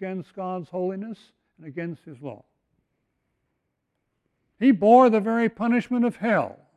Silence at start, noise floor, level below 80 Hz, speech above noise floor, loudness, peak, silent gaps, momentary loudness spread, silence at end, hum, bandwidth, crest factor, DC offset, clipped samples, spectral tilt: 0 s; -78 dBFS; -70 dBFS; 55 dB; -22 LUFS; -6 dBFS; none; 23 LU; 0.25 s; none; 8.4 kHz; 20 dB; under 0.1%; under 0.1%; -8 dB/octave